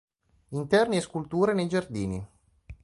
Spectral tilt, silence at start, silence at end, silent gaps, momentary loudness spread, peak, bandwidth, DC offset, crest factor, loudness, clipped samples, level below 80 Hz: -6 dB/octave; 0.5 s; 0.1 s; none; 14 LU; -10 dBFS; 11.5 kHz; under 0.1%; 18 dB; -27 LUFS; under 0.1%; -54 dBFS